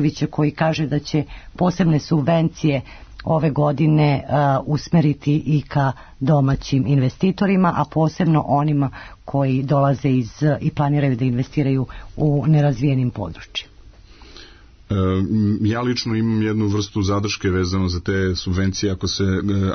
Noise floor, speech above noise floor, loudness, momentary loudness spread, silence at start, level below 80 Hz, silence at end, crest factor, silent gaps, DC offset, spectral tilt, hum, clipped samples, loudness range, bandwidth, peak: -44 dBFS; 25 dB; -20 LUFS; 6 LU; 0 s; -42 dBFS; 0 s; 12 dB; none; under 0.1%; -7 dB/octave; none; under 0.1%; 3 LU; 6.6 kHz; -6 dBFS